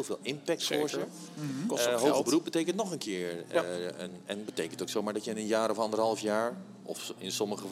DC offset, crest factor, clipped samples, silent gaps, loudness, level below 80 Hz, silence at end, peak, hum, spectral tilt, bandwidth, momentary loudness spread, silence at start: under 0.1%; 20 dB; under 0.1%; none; -32 LUFS; -86 dBFS; 0 s; -12 dBFS; none; -4 dB/octave; 16.5 kHz; 11 LU; 0 s